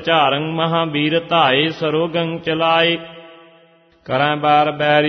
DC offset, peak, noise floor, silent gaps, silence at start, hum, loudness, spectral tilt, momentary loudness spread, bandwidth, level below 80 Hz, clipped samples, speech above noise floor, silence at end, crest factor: under 0.1%; -2 dBFS; -51 dBFS; none; 0 s; none; -16 LUFS; -7 dB/octave; 7 LU; 6.4 kHz; -58 dBFS; under 0.1%; 35 dB; 0 s; 16 dB